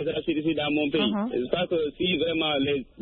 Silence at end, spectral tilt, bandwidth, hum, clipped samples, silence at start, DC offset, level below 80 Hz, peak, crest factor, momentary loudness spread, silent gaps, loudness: 0 s; -10 dB/octave; 4.4 kHz; none; under 0.1%; 0 s; under 0.1%; -54 dBFS; -10 dBFS; 16 dB; 3 LU; none; -26 LUFS